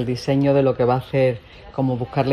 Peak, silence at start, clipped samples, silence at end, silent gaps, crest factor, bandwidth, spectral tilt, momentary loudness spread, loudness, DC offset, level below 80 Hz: -4 dBFS; 0 s; under 0.1%; 0 s; none; 14 dB; 12 kHz; -8 dB/octave; 8 LU; -20 LUFS; under 0.1%; -48 dBFS